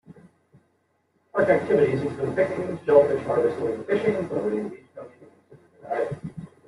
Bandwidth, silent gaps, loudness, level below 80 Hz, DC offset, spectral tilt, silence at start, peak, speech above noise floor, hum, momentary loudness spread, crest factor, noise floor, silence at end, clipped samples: 11 kHz; none; -24 LUFS; -64 dBFS; under 0.1%; -8 dB/octave; 0.1 s; -4 dBFS; 47 dB; none; 17 LU; 20 dB; -69 dBFS; 0.2 s; under 0.1%